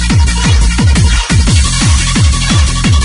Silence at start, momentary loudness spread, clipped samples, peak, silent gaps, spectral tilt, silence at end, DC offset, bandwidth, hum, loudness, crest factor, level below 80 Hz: 0 s; 1 LU; under 0.1%; 0 dBFS; none; -4 dB/octave; 0 s; under 0.1%; 11 kHz; none; -10 LUFS; 8 dB; -12 dBFS